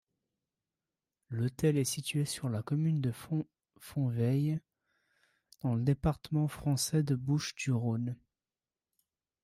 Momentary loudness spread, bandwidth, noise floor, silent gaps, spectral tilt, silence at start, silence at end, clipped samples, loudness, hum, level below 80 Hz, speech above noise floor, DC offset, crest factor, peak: 8 LU; 15.5 kHz; under -90 dBFS; none; -6 dB/octave; 1.3 s; 1.3 s; under 0.1%; -33 LUFS; none; -58 dBFS; over 58 dB; under 0.1%; 16 dB; -18 dBFS